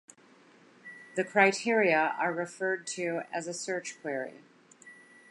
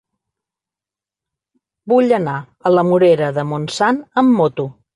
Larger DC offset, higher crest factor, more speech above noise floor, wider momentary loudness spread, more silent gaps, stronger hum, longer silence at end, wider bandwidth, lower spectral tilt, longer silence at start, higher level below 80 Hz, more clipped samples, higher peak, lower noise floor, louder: neither; first, 24 dB vs 14 dB; second, 30 dB vs 74 dB; first, 15 LU vs 9 LU; neither; neither; first, 0.4 s vs 0.25 s; about the same, 11.5 kHz vs 11 kHz; second, -3.5 dB/octave vs -6.5 dB/octave; second, 0.85 s vs 1.85 s; second, -86 dBFS vs -58 dBFS; neither; second, -8 dBFS vs -2 dBFS; second, -59 dBFS vs -89 dBFS; second, -29 LUFS vs -16 LUFS